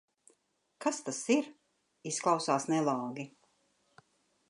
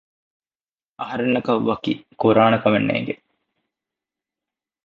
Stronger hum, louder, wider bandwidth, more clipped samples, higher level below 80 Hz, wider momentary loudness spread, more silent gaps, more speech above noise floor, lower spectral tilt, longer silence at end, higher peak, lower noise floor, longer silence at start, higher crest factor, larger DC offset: neither; second, -32 LUFS vs -20 LUFS; first, 11.5 kHz vs 6.8 kHz; neither; second, -88 dBFS vs -60 dBFS; about the same, 15 LU vs 14 LU; neither; second, 44 dB vs over 71 dB; second, -4 dB/octave vs -8.5 dB/octave; second, 1.2 s vs 1.7 s; second, -14 dBFS vs -2 dBFS; second, -75 dBFS vs under -90 dBFS; second, 0.8 s vs 1 s; about the same, 20 dB vs 22 dB; neither